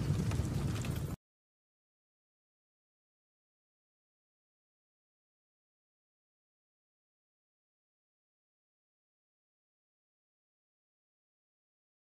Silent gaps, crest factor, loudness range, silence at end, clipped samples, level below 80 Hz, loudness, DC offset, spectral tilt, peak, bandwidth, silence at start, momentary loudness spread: none; 24 dB; 12 LU; 10.9 s; under 0.1%; -54 dBFS; -37 LUFS; under 0.1%; -6.5 dB/octave; -22 dBFS; 15.5 kHz; 0 s; 9 LU